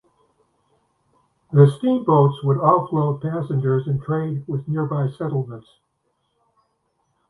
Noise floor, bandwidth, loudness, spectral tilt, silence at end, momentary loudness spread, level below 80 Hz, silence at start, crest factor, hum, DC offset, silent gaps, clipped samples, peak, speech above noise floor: -71 dBFS; 4 kHz; -20 LUFS; -10 dB/octave; 1.7 s; 10 LU; -60 dBFS; 1.5 s; 22 dB; none; under 0.1%; none; under 0.1%; 0 dBFS; 52 dB